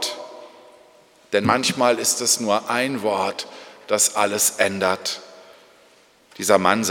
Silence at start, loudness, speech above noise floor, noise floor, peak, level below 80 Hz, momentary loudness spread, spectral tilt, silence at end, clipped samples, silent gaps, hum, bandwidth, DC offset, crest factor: 0 s; -20 LUFS; 34 dB; -54 dBFS; 0 dBFS; -70 dBFS; 15 LU; -2 dB/octave; 0 s; under 0.1%; none; none; 19 kHz; under 0.1%; 22 dB